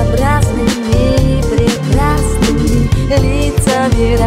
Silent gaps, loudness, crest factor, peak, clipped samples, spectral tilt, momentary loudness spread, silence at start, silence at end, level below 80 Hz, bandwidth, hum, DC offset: none; -13 LUFS; 10 dB; -2 dBFS; under 0.1%; -6 dB/octave; 1 LU; 0 s; 0 s; -16 dBFS; 16 kHz; none; under 0.1%